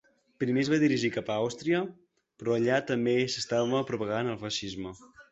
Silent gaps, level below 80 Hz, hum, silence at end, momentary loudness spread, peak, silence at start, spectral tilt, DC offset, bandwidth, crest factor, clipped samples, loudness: none; -64 dBFS; none; 0.1 s; 10 LU; -12 dBFS; 0.4 s; -5 dB/octave; under 0.1%; 8.2 kHz; 16 dB; under 0.1%; -29 LUFS